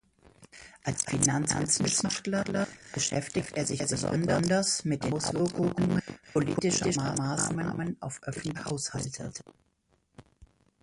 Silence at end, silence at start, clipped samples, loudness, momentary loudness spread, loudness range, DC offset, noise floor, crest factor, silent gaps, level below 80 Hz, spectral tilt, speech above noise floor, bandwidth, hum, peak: 0.35 s; 0.4 s; under 0.1%; -29 LUFS; 10 LU; 5 LU; under 0.1%; -72 dBFS; 20 dB; none; -56 dBFS; -4 dB/octave; 42 dB; 11.5 kHz; none; -10 dBFS